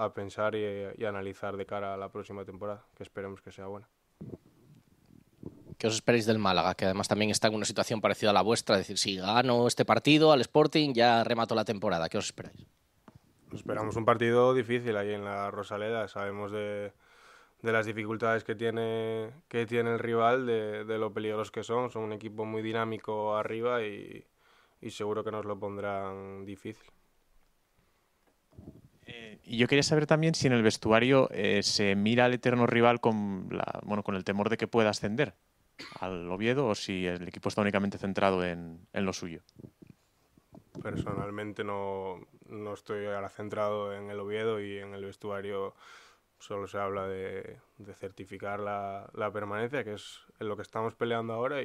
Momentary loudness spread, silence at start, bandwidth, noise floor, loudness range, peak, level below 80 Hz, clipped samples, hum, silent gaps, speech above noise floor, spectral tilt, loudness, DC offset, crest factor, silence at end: 18 LU; 0 s; 14.5 kHz; -71 dBFS; 13 LU; -6 dBFS; -66 dBFS; under 0.1%; none; none; 40 dB; -5 dB/octave; -30 LUFS; under 0.1%; 24 dB; 0 s